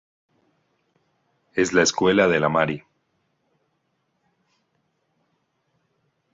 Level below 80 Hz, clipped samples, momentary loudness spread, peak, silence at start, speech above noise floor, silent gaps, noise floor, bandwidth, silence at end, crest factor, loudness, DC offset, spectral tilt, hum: -60 dBFS; under 0.1%; 10 LU; -4 dBFS; 1.55 s; 53 dB; none; -72 dBFS; 8 kHz; 3.55 s; 22 dB; -20 LUFS; under 0.1%; -4 dB/octave; none